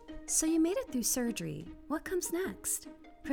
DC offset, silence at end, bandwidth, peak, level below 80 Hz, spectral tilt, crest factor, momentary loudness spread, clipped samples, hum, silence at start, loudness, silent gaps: under 0.1%; 0 s; 19 kHz; -16 dBFS; -56 dBFS; -3 dB/octave; 18 dB; 13 LU; under 0.1%; none; 0 s; -33 LUFS; none